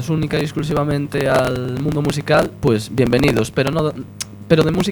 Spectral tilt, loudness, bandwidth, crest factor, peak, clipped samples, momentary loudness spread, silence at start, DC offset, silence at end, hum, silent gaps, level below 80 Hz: -6 dB/octave; -18 LUFS; 19 kHz; 18 dB; 0 dBFS; under 0.1%; 6 LU; 0 s; under 0.1%; 0 s; none; none; -40 dBFS